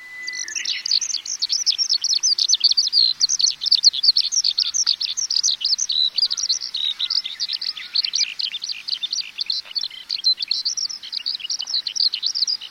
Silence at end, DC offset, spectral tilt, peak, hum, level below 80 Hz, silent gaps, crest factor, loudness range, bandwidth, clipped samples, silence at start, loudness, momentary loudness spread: 0 s; under 0.1%; 5 dB/octave; -2 dBFS; none; -72 dBFS; none; 20 dB; 7 LU; 16 kHz; under 0.1%; 0 s; -18 LUFS; 10 LU